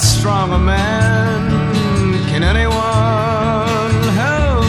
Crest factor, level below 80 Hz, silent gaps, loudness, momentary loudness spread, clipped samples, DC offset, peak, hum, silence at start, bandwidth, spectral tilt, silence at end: 12 dB; -22 dBFS; none; -15 LUFS; 2 LU; under 0.1%; under 0.1%; 0 dBFS; none; 0 s; 13.5 kHz; -5.5 dB/octave; 0 s